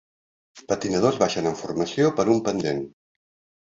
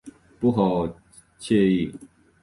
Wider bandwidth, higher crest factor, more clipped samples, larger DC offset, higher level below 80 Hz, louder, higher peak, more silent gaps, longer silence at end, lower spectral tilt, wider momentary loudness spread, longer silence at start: second, 7.8 kHz vs 11.5 kHz; about the same, 20 dB vs 16 dB; neither; neither; second, -58 dBFS vs -52 dBFS; about the same, -23 LUFS vs -23 LUFS; first, -4 dBFS vs -8 dBFS; neither; first, 0.7 s vs 0.35 s; second, -5.5 dB/octave vs -7.5 dB/octave; second, 8 LU vs 12 LU; first, 0.55 s vs 0.05 s